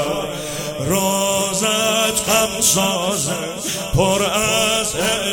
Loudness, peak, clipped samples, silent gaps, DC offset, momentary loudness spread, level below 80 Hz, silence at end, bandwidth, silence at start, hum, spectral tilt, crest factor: -17 LUFS; -2 dBFS; under 0.1%; none; under 0.1%; 9 LU; -40 dBFS; 0 s; 17.5 kHz; 0 s; none; -2.5 dB/octave; 16 dB